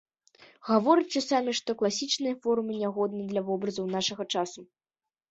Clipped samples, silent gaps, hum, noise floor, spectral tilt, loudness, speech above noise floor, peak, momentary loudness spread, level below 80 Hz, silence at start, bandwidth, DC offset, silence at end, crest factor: under 0.1%; none; none; under -90 dBFS; -4 dB/octave; -28 LUFS; over 62 dB; -10 dBFS; 7 LU; -74 dBFS; 0.4 s; 8.2 kHz; under 0.1%; 0.65 s; 20 dB